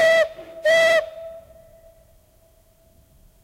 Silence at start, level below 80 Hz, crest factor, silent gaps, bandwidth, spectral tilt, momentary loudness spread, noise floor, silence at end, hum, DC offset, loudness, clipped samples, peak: 0 s; -58 dBFS; 14 dB; none; 16 kHz; -1.5 dB/octave; 22 LU; -56 dBFS; 2.05 s; none; under 0.1%; -18 LUFS; under 0.1%; -8 dBFS